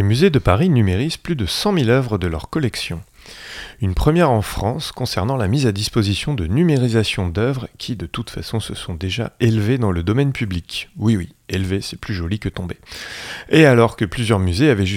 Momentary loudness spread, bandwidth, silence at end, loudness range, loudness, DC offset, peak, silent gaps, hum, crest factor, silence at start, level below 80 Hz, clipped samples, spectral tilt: 13 LU; 16.5 kHz; 0 s; 3 LU; -19 LUFS; under 0.1%; 0 dBFS; none; none; 18 dB; 0 s; -36 dBFS; under 0.1%; -6 dB/octave